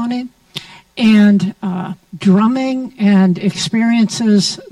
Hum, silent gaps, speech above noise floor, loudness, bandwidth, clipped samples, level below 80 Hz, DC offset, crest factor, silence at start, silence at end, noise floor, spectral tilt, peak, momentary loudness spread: none; none; 20 dB; -14 LUFS; 11.5 kHz; under 0.1%; -56 dBFS; under 0.1%; 12 dB; 0 s; 0.05 s; -33 dBFS; -5.5 dB/octave; -2 dBFS; 17 LU